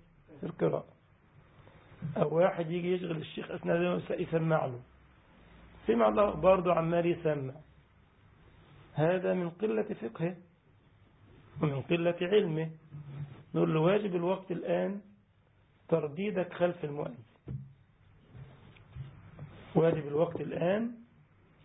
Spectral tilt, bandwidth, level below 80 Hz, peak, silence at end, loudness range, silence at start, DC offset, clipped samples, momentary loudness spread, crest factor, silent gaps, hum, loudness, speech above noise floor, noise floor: -5 dB/octave; 3.9 kHz; -62 dBFS; -12 dBFS; 0.6 s; 6 LU; 0.3 s; under 0.1%; under 0.1%; 20 LU; 22 dB; none; none; -31 LUFS; 36 dB; -66 dBFS